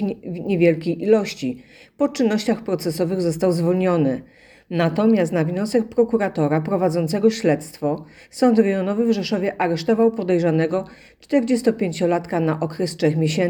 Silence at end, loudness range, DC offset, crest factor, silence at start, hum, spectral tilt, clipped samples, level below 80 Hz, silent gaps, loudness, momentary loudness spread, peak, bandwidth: 0 s; 1 LU; under 0.1%; 18 dB; 0 s; none; -6.5 dB/octave; under 0.1%; -58 dBFS; none; -20 LUFS; 8 LU; -2 dBFS; 19 kHz